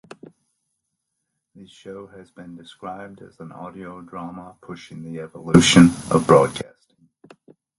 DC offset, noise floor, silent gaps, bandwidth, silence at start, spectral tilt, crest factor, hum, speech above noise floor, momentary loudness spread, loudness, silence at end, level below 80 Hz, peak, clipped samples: under 0.1%; -78 dBFS; none; 11.5 kHz; 1.85 s; -5 dB/octave; 22 dB; none; 58 dB; 27 LU; -15 LUFS; 1.2 s; -50 dBFS; 0 dBFS; under 0.1%